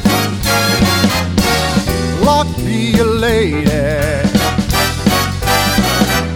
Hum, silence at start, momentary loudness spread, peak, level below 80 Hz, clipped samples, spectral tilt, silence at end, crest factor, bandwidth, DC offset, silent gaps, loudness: none; 0 s; 3 LU; 0 dBFS; -26 dBFS; under 0.1%; -4.5 dB/octave; 0 s; 14 dB; 19.5 kHz; under 0.1%; none; -13 LUFS